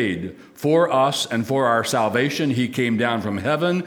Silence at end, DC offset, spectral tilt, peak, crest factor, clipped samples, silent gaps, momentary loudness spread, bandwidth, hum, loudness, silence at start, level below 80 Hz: 0 s; under 0.1%; -5 dB/octave; -4 dBFS; 16 dB; under 0.1%; none; 6 LU; over 20 kHz; none; -21 LUFS; 0 s; -60 dBFS